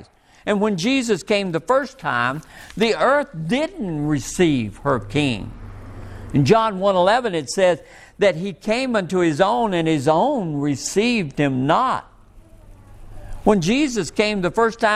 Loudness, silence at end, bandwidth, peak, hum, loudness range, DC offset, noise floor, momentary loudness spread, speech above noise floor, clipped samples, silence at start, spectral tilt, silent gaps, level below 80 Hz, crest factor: -20 LUFS; 0 s; 14.5 kHz; -2 dBFS; none; 2 LU; under 0.1%; -46 dBFS; 8 LU; 27 dB; under 0.1%; 0 s; -5 dB/octave; none; -44 dBFS; 18 dB